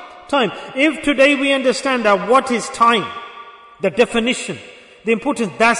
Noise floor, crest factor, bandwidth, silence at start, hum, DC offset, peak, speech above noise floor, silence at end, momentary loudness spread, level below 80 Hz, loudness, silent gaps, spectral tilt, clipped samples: -39 dBFS; 14 dB; 11 kHz; 0 s; none; under 0.1%; -2 dBFS; 22 dB; 0 s; 14 LU; -52 dBFS; -16 LUFS; none; -3.5 dB/octave; under 0.1%